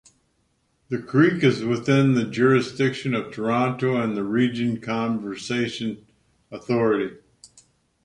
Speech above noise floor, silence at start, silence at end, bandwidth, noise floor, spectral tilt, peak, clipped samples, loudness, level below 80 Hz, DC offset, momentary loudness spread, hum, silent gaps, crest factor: 46 dB; 0.9 s; 0.9 s; 10.5 kHz; -68 dBFS; -6.5 dB/octave; -6 dBFS; under 0.1%; -23 LUFS; -62 dBFS; under 0.1%; 12 LU; none; none; 18 dB